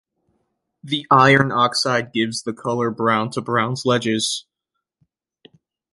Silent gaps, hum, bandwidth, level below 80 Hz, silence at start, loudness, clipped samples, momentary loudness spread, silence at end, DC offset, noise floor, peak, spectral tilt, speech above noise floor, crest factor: none; none; 11.5 kHz; -60 dBFS; 0.85 s; -19 LUFS; under 0.1%; 11 LU; 1.5 s; under 0.1%; -80 dBFS; -2 dBFS; -4.5 dB/octave; 62 dB; 20 dB